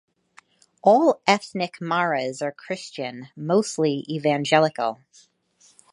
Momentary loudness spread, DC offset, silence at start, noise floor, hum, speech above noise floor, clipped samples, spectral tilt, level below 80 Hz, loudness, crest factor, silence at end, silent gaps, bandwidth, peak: 14 LU; under 0.1%; 0.85 s; -59 dBFS; none; 37 dB; under 0.1%; -5 dB/octave; -76 dBFS; -23 LUFS; 22 dB; 1 s; none; 11.5 kHz; -2 dBFS